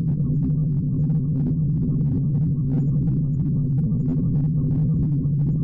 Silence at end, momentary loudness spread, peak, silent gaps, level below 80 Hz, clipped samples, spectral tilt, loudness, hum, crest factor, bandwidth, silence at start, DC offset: 0 s; 1 LU; -16 dBFS; none; -36 dBFS; under 0.1%; -14 dB/octave; -22 LUFS; none; 6 dB; 1.4 kHz; 0 s; under 0.1%